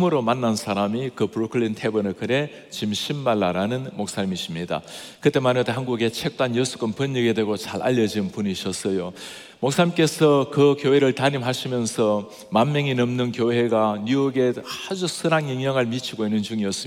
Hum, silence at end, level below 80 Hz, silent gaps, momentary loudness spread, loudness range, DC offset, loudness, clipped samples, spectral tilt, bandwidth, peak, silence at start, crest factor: none; 0 s; -66 dBFS; none; 9 LU; 4 LU; under 0.1%; -23 LUFS; under 0.1%; -5.5 dB/octave; 17 kHz; -4 dBFS; 0 s; 18 dB